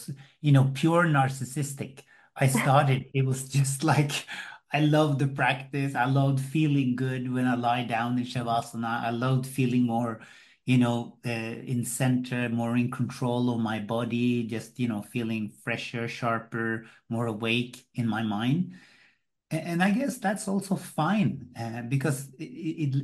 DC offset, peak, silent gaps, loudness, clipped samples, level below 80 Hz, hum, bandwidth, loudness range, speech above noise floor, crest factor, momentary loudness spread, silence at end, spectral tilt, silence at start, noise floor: under 0.1%; -8 dBFS; none; -27 LUFS; under 0.1%; -68 dBFS; none; 12.5 kHz; 5 LU; 39 dB; 20 dB; 11 LU; 0 s; -6 dB/octave; 0 s; -65 dBFS